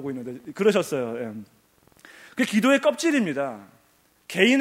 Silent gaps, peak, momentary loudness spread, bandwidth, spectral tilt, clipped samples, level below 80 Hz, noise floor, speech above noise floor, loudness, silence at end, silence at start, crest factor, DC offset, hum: none; -2 dBFS; 17 LU; 16 kHz; -4.5 dB/octave; under 0.1%; -72 dBFS; -62 dBFS; 39 dB; -23 LUFS; 0 s; 0 s; 22 dB; under 0.1%; none